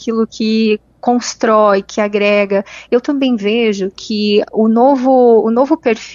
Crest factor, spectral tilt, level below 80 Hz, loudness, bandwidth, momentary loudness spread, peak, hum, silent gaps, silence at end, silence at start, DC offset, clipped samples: 12 dB; -5 dB/octave; -54 dBFS; -13 LUFS; 7.6 kHz; 7 LU; 0 dBFS; none; none; 0 s; 0 s; under 0.1%; under 0.1%